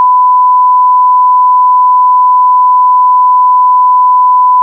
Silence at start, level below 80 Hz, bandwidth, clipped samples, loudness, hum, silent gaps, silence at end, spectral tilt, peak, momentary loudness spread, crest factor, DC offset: 0 s; under -90 dBFS; 1.1 kHz; under 0.1%; -6 LUFS; none; none; 0 s; 8.5 dB/octave; -2 dBFS; 0 LU; 4 dB; under 0.1%